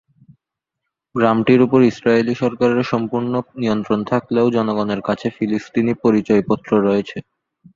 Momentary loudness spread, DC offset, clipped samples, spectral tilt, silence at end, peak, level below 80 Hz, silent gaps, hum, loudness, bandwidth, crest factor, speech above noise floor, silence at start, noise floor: 8 LU; under 0.1%; under 0.1%; -7.5 dB/octave; 0.55 s; -2 dBFS; -54 dBFS; none; none; -18 LUFS; 7.4 kHz; 16 dB; 65 dB; 1.15 s; -82 dBFS